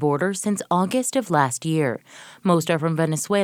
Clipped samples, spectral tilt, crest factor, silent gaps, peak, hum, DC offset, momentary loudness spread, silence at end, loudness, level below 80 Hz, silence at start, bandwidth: under 0.1%; -5 dB/octave; 18 dB; none; -4 dBFS; none; under 0.1%; 5 LU; 0 s; -22 LUFS; -68 dBFS; 0 s; 17.5 kHz